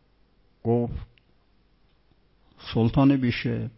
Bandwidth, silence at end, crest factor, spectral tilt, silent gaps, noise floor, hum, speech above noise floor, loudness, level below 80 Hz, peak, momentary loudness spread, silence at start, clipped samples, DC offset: 5.8 kHz; 0.1 s; 18 dB; -11.5 dB/octave; none; -63 dBFS; none; 40 dB; -24 LUFS; -46 dBFS; -8 dBFS; 15 LU; 0.65 s; under 0.1%; under 0.1%